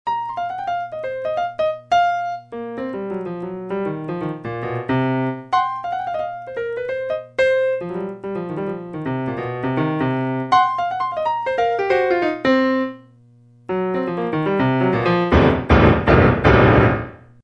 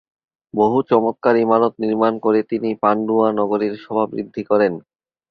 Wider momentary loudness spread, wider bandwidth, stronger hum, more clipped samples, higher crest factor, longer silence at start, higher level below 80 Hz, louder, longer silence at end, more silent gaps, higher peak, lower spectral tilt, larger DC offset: first, 13 LU vs 7 LU; first, 8.4 kHz vs 6 kHz; neither; neither; about the same, 20 dB vs 16 dB; second, 0.05 s vs 0.55 s; first, -34 dBFS vs -62 dBFS; about the same, -20 LUFS vs -18 LUFS; second, 0.25 s vs 0.5 s; neither; about the same, 0 dBFS vs -2 dBFS; about the same, -8 dB/octave vs -9 dB/octave; neither